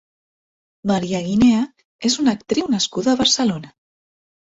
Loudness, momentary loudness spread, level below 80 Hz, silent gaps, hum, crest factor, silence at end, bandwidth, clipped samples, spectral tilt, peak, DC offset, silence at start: -19 LUFS; 9 LU; -52 dBFS; 1.85-1.99 s; none; 16 dB; 0.85 s; 8 kHz; under 0.1%; -4 dB/octave; -4 dBFS; under 0.1%; 0.85 s